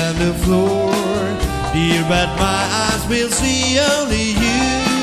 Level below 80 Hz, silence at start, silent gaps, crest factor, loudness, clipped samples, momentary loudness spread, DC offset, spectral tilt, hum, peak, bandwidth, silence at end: -28 dBFS; 0 s; none; 16 dB; -16 LUFS; under 0.1%; 4 LU; under 0.1%; -4 dB/octave; none; 0 dBFS; 15.5 kHz; 0 s